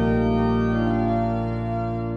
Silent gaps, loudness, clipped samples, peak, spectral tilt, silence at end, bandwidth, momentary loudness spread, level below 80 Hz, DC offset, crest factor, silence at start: none; -23 LUFS; under 0.1%; -10 dBFS; -9.5 dB/octave; 0 s; 6.6 kHz; 5 LU; -34 dBFS; under 0.1%; 12 dB; 0 s